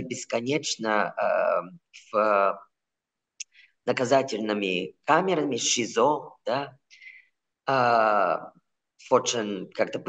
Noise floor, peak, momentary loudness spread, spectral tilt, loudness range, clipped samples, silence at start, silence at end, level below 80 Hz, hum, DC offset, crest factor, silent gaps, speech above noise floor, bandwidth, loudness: -87 dBFS; -6 dBFS; 13 LU; -3 dB/octave; 2 LU; under 0.1%; 0 s; 0 s; -88 dBFS; none; under 0.1%; 20 dB; none; 61 dB; 9.2 kHz; -25 LUFS